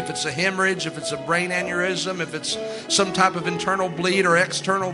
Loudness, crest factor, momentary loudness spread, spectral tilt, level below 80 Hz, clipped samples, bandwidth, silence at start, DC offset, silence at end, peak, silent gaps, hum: -22 LUFS; 20 dB; 8 LU; -3 dB/octave; -62 dBFS; under 0.1%; 11.5 kHz; 0 s; under 0.1%; 0 s; -4 dBFS; none; none